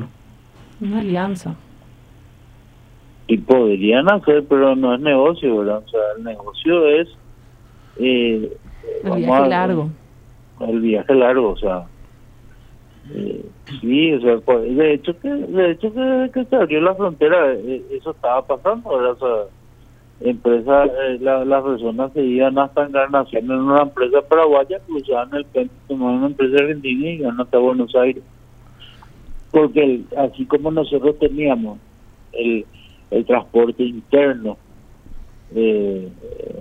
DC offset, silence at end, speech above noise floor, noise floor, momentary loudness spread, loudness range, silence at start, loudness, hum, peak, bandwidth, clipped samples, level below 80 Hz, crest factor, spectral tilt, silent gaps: under 0.1%; 0 s; 29 dB; -46 dBFS; 13 LU; 4 LU; 0 s; -17 LUFS; none; 0 dBFS; 8.6 kHz; under 0.1%; -44 dBFS; 18 dB; -7.5 dB/octave; none